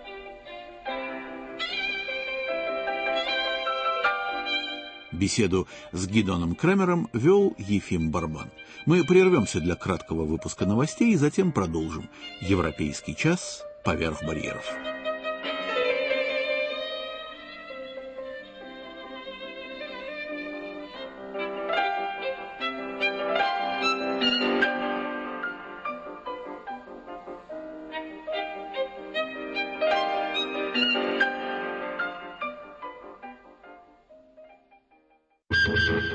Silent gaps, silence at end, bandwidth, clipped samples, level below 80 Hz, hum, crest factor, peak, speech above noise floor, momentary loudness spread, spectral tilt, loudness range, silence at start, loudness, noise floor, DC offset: none; 0 s; 8.8 kHz; under 0.1%; -52 dBFS; none; 22 dB; -6 dBFS; 41 dB; 16 LU; -5 dB/octave; 12 LU; 0 s; -27 LUFS; -66 dBFS; under 0.1%